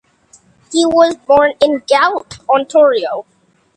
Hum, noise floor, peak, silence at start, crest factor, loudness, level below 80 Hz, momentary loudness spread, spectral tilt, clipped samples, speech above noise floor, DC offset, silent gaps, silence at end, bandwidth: none; -49 dBFS; 0 dBFS; 0.7 s; 14 dB; -13 LUFS; -52 dBFS; 10 LU; -3 dB/octave; under 0.1%; 37 dB; under 0.1%; none; 0.55 s; 9.8 kHz